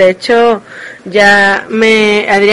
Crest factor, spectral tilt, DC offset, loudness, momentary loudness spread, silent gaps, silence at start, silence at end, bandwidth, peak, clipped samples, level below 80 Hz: 8 dB; -4 dB/octave; under 0.1%; -8 LUFS; 12 LU; none; 0 s; 0 s; 11.5 kHz; 0 dBFS; 0.6%; -48 dBFS